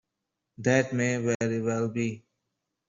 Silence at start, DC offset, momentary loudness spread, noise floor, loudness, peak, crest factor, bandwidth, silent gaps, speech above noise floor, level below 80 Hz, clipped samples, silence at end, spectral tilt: 0.6 s; under 0.1%; 8 LU; -84 dBFS; -28 LUFS; -10 dBFS; 20 dB; 7.8 kHz; 1.35-1.40 s; 57 dB; -66 dBFS; under 0.1%; 0.7 s; -6 dB/octave